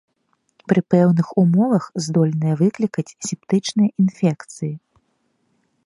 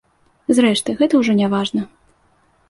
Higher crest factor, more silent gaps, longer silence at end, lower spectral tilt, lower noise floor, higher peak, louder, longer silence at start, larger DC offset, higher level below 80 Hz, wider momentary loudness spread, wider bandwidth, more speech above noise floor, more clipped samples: about the same, 18 dB vs 16 dB; neither; first, 1.1 s vs 0.85 s; first, -7 dB/octave vs -5 dB/octave; first, -68 dBFS vs -58 dBFS; about the same, 0 dBFS vs -2 dBFS; about the same, -19 LUFS vs -17 LUFS; first, 0.7 s vs 0.5 s; neither; second, -64 dBFS vs -58 dBFS; about the same, 13 LU vs 12 LU; about the same, 11.5 kHz vs 11.5 kHz; first, 50 dB vs 42 dB; neither